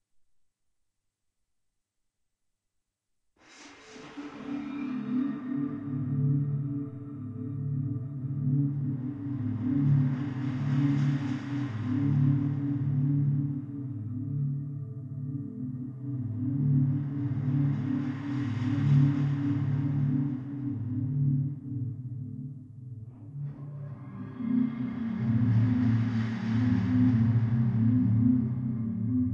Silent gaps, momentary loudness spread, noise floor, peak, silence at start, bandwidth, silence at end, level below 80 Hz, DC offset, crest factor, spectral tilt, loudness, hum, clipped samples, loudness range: none; 14 LU; -82 dBFS; -12 dBFS; 3.5 s; 6.4 kHz; 0 s; -60 dBFS; under 0.1%; 16 dB; -10 dB/octave; -29 LUFS; none; under 0.1%; 9 LU